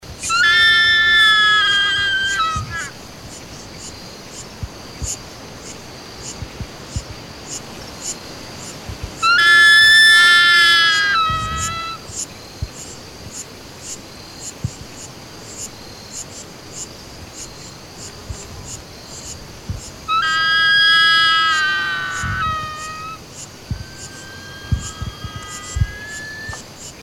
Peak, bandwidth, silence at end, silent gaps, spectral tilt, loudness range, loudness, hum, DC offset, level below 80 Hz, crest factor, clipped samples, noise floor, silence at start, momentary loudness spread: -4 dBFS; over 20 kHz; 0 s; none; -1 dB/octave; 21 LU; -13 LUFS; none; 0.2%; -38 dBFS; 14 dB; under 0.1%; -36 dBFS; 0.05 s; 24 LU